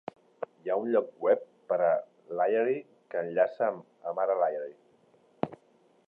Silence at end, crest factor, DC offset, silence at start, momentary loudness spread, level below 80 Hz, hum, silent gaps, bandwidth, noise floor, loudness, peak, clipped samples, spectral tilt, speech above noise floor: 0.5 s; 20 dB; under 0.1%; 0.4 s; 12 LU; -80 dBFS; none; none; 4.7 kHz; -65 dBFS; -30 LUFS; -10 dBFS; under 0.1%; -9 dB/octave; 37 dB